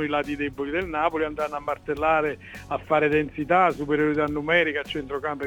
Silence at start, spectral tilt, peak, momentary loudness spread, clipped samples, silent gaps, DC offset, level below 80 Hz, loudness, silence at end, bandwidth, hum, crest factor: 0 s; -6.5 dB/octave; -6 dBFS; 9 LU; under 0.1%; none; under 0.1%; -48 dBFS; -24 LUFS; 0 s; 18.5 kHz; none; 18 dB